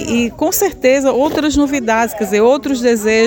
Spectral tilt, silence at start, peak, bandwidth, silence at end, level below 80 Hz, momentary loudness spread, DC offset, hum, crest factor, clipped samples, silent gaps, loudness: -3.5 dB/octave; 0 s; -2 dBFS; 17 kHz; 0 s; -38 dBFS; 3 LU; under 0.1%; none; 12 dB; under 0.1%; none; -14 LUFS